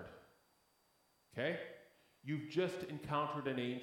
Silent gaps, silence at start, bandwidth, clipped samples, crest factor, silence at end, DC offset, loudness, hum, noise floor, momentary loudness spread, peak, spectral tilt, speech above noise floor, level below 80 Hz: none; 0 s; 17 kHz; under 0.1%; 18 dB; 0 s; under 0.1%; -41 LUFS; none; -75 dBFS; 15 LU; -24 dBFS; -6.5 dB/octave; 36 dB; -76 dBFS